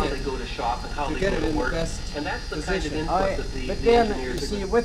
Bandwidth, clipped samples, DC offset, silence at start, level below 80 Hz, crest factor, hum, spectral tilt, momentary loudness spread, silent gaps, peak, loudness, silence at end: 14 kHz; under 0.1%; under 0.1%; 0 s; -32 dBFS; 18 dB; none; -5 dB/octave; 9 LU; none; -8 dBFS; -26 LUFS; 0 s